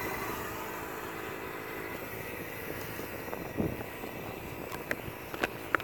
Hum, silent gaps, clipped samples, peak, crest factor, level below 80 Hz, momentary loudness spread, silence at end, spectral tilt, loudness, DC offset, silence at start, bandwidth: none; none; under 0.1%; -6 dBFS; 32 dB; -56 dBFS; 5 LU; 0 s; -4.5 dB/octave; -38 LUFS; under 0.1%; 0 s; over 20 kHz